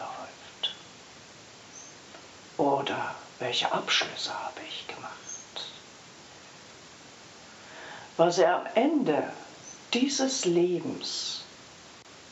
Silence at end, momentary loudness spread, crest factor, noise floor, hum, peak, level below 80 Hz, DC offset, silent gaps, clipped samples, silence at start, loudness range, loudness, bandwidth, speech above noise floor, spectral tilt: 0 s; 23 LU; 22 dB; -50 dBFS; none; -8 dBFS; -74 dBFS; under 0.1%; none; under 0.1%; 0 s; 13 LU; -29 LUFS; 8.2 kHz; 23 dB; -3 dB/octave